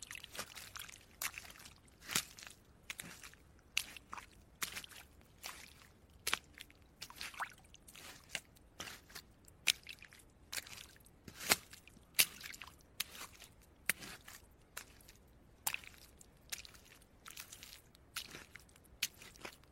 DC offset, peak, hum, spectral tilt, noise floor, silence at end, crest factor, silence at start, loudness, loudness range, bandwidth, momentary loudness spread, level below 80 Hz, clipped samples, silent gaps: under 0.1%; -6 dBFS; none; 0 dB/octave; -64 dBFS; 0 s; 40 dB; 0 s; -42 LUFS; 10 LU; 16.5 kHz; 23 LU; -68 dBFS; under 0.1%; none